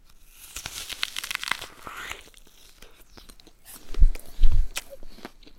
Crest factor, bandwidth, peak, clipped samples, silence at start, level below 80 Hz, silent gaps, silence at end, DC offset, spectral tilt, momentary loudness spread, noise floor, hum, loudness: 20 dB; 15.5 kHz; -2 dBFS; under 0.1%; 0.55 s; -26 dBFS; none; 0.45 s; under 0.1%; -2.5 dB/octave; 23 LU; -50 dBFS; none; -31 LUFS